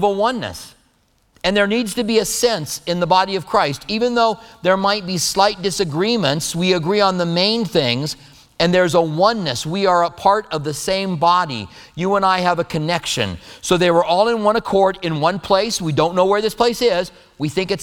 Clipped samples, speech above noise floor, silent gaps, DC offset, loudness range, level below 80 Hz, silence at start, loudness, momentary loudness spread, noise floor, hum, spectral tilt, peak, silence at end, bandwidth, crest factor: under 0.1%; 42 dB; none; under 0.1%; 2 LU; -48 dBFS; 0 s; -18 LUFS; 7 LU; -60 dBFS; none; -4 dB/octave; 0 dBFS; 0 s; 18.5 kHz; 18 dB